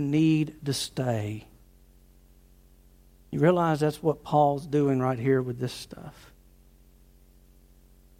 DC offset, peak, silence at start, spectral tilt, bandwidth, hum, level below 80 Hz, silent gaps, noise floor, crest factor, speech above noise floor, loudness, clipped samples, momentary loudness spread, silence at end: under 0.1%; -8 dBFS; 0 s; -6.5 dB/octave; 16 kHz; 60 Hz at -60 dBFS; -56 dBFS; none; -56 dBFS; 20 dB; 30 dB; -26 LUFS; under 0.1%; 15 LU; 2.1 s